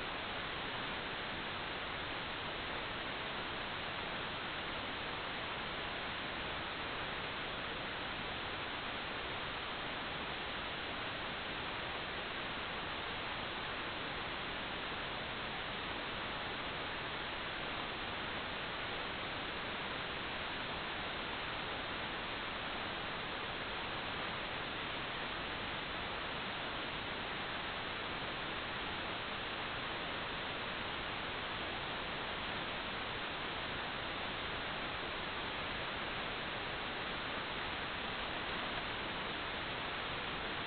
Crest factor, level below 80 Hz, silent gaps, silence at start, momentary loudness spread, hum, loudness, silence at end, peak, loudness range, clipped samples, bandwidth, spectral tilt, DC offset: 16 dB; -58 dBFS; none; 0 s; 1 LU; none; -40 LUFS; 0 s; -26 dBFS; 1 LU; under 0.1%; 4.9 kHz; -1 dB/octave; under 0.1%